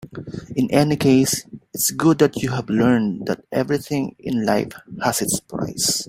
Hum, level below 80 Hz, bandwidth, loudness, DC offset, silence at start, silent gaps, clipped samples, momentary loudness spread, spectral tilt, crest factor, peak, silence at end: none; -52 dBFS; 16.5 kHz; -20 LUFS; under 0.1%; 0.05 s; none; under 0.1%; 11 LU; -4.5 dB/octave; 18 dB; -2 dBFS; 0.05 s